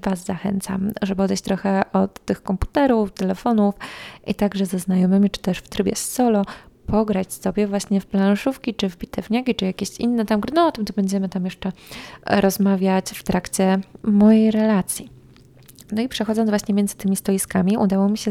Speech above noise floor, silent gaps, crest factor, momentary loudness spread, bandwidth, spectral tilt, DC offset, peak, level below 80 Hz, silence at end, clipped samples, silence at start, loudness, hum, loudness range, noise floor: 28 dB; none; 18 dB; 8 LU; 15.5 kHz; -6 dB/octave; under 0.1%; -4 dBFS; -44 dBFS; 0 s; under 0.1%; 0.05 s; -21 LUFS; none; 3 LU; -48 dBFS